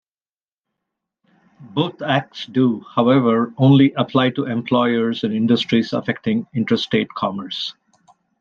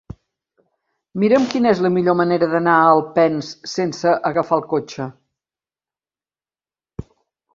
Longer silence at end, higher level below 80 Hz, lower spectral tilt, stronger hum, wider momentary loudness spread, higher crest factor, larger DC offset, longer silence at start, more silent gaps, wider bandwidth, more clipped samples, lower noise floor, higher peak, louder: first, 0.7 s vs 0.55 s; second, -64 dBFS vs -54 dBFS; first, -7.5 dB/octave vs -6 dB/octave; neither; second, 10 LU vs 18 LU; about the same, 16 dB vs 18 dB; neither; first, 1.6 s vs 1.15 s; neither; about the same, 7.2 kHz vs 7.6 kHz; neither; about the same, under -90 dBFS vs under -90 dBFS; about the same, -2 dBFS vs -2 dBFS; about the same, -19 LUFS vs -17 LUFS